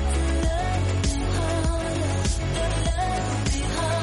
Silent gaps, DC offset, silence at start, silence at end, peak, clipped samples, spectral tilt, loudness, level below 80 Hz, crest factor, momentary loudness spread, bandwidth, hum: none; under 0.1%; 0 s; 0 s; -14 dBFS; under 0.1%; -5 dB/octave; -25 LUFS; -28 dBFS; 10 dB; 1 LU; 11.5 kHz; none